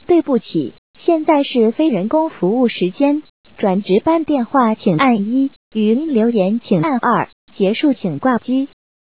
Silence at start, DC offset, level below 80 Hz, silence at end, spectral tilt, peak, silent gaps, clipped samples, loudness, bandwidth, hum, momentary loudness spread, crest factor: 0.1 s; 0.4%; -58 dBFS; 0.5 s; -11 dB/octave; -2 dBFS; 0.78-0.94 s, 3.29-3.44 s, 5.56-5.71 s, 7.33-7.47 s; under 0.1%; -16 LUFS; 4 kHz; none; 6 LU; 14 dB